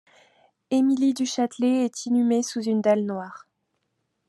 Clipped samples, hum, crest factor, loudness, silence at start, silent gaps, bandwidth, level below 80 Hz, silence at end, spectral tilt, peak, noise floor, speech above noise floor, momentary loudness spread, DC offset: under 0.1%; none; 16 dB; -23 LUFS; 0.7 s; none; 12 kHz; -80 dBFS; 0.9 s; -5 dB/octave; -8 dBFS; -76 dBFS; 53 dB; 6 LU; under 0.1%